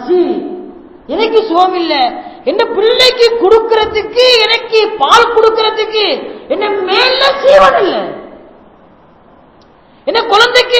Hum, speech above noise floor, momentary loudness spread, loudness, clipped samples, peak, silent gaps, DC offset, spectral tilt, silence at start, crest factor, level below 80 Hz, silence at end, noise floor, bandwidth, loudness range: none; 34 dB; 13 LU; -9 LUFS; 2%; 0 dBFS; none; 0.2%; -2.5 dB/octave; 0 s; 10 dB; -44 dBFS; 0 s; -43 dBFS; 8 kHz; 4 LU